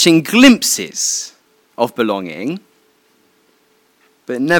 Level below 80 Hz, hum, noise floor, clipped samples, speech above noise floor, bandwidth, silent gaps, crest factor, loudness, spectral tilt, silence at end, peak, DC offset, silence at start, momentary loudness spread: -54 dBFS; none; -57 dBFS; 0.2%; 43 dB; 17.5 kHz; none; 16 dB; -14 LUFS; -3 dB/octave; 0 s; 0 dBFS; under 0.1%; 0 s; 17 LU